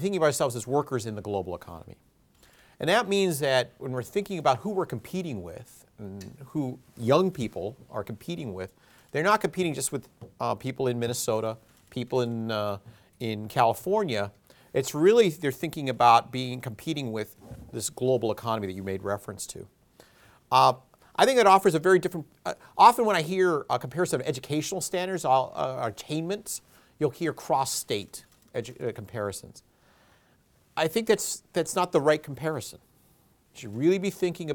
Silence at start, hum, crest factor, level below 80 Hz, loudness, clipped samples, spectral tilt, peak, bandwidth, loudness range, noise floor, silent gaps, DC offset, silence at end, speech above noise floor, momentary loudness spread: 0 s; none; 24 dB; -64 dBFS; -27 LUFS; under 0.1%; -4.5 dB/octave; -4 dBFS; 19.5 kHz; 8 LU; -64 dBFS; none; under 0.1%; 0 s; 37 dB; 16 LU